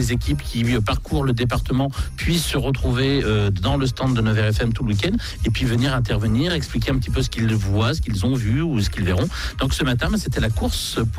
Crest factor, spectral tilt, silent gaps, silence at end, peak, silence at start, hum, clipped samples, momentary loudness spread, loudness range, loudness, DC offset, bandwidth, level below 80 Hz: 10 dB; -5.5 dB/octave; none; 0 s; -10 dBFS; 0 s; none; under 0.1%; 3 LU; 1 LU; -21 LUFS; under 0.1%; 16 kHz; -28 dBFS